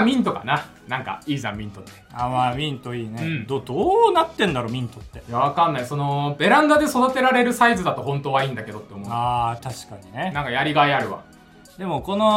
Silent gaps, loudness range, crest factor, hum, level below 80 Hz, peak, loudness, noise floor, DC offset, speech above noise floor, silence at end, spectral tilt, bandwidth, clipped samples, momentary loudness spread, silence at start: none; 6 LU; 20 dB; none; -50 dBFS; -2 dBFS; -21 LUFS; -48 dBFS; under 0.1%; 27 dB; 0 s; -5.5 dB/octave; 16 kHz; under 0.1%; 16 LU; 0 s